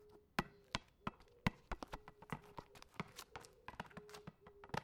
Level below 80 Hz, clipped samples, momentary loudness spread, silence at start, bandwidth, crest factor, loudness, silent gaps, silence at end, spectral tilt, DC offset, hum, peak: -62 dBFS; under 0.1%; 13 LU; 0 s; 19.5 kHz; 34 dB; -50 LUFS; none; 0 s; -4.5 dB/octave; under 0.1%; none; -16 dBFS